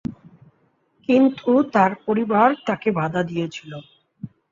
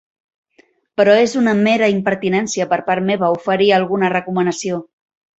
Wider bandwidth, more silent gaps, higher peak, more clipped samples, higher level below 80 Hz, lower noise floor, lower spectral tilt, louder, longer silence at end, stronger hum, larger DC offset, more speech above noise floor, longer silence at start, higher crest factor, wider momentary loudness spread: about the same, 7.6 kHz vs 8.2 kHz; neither; about the same, -4 dBFS vs -2 dBFS; neither; about the same, -60 dBFS vs -60 dBFS; first, -64 dBFS vs -56 dBFS; first, -7.5 dB/octave vs -5 dB/octave; second, -20 LUFS vs -16 LUFS; second, 0.25 s vs 0.55 s; neither; neither; first, 44 dB vs 40 dB; second, 0.1 s vs 1 s; about the same, 18 dB vs 16 dB; first, 21 LU vs 6 LU